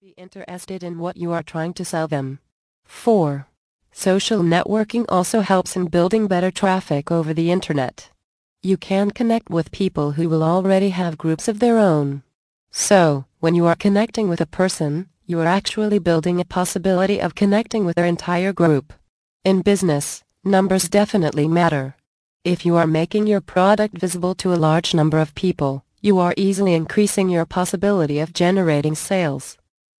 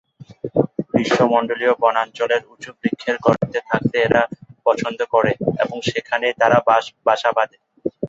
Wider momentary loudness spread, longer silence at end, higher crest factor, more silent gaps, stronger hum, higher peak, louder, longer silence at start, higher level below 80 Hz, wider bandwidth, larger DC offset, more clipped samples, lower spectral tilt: about the same, 9 LU vs 8 LU; first, 0.45 s vs 0 s; about the same, 16 dB vs 18 dB; first, 2.52-2.83 s, 3.57-3.79 s, 8.24-8.56 s, 12.35-12.67 s, 19.09-19.40 s, 22.07-22.40 s vs none; neither; about the same, -2 dBFS vs -2 dBFS; about the same, -19 LUFS vs -19 LUFS; about the same, 0.2 s vs 0.2 s; about the same, -52 dBFS vs -56 dBFS; first, 11 kHz vs 8 kHz; neither; neither; about the same, -5.5 dB/octave vs -6 dB/octave